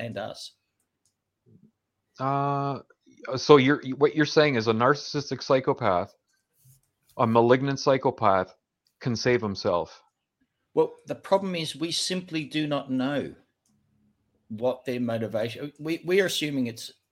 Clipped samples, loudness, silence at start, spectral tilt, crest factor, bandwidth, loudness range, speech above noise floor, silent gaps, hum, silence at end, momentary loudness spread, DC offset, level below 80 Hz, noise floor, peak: under 0.1%; -25 LUFS; 0 s; -5.5 dB/octave; 26 dB; 16.5 kHz; 8 LU; 51 dB; none; none; 0.2 s; 14 LU; under 0.1%; -66 dBFS; -76 dBFS; 0 dBFS